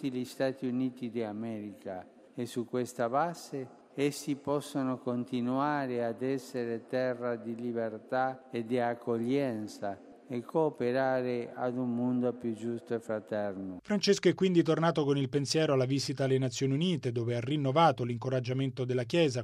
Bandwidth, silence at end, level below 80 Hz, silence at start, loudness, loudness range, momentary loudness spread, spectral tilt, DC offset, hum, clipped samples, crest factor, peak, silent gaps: 15 kHz; 0 s; -74 dBFS; 0 s; -32 LUFS; 6 LU; 12 LU; -6 dB/octave; under 0.1%; none; under 0.1%; 20 dB; -12 dBFS; none